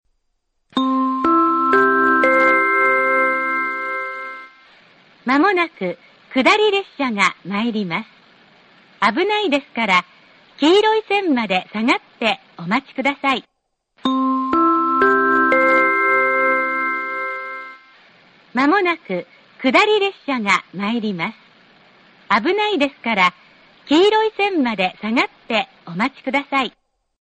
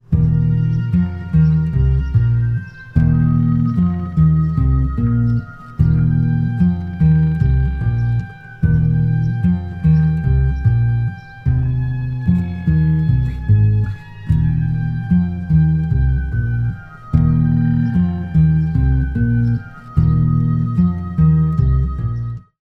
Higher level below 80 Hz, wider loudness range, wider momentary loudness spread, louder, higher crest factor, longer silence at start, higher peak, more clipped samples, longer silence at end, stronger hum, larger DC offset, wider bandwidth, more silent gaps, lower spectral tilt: second, -62 dBFS vs -24 dBFS; first, 5 LU vs 1 LU; first, 11 LU vs 7 LU; about the same, -17 LUFS vs -17 LUFS; about the same, 18 dB vs 14 dB; first, 0.75 s vs 0.1 s; about the same, 0 dBFS vs 0 dBFS; neither; first, 0.5 s vs 0.2 s; neither; neither; first, 9 kHz vs 4.2 kHz; neither; second, -4.5 dB/octave vs -11 dB/octave